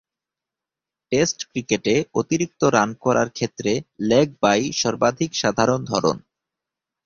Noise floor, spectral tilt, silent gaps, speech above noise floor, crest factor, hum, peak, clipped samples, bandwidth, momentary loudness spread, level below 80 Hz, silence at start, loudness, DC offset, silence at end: -88 dBFS; -4.5 dB/octave; none; 67 dB; 20 dB; none; -2 dBFS; under 0.1%; 7.6 kHz; 6 LU; -56 dBFS; 1.1 s; -21 LUFS; under 0.1%; 0.85 s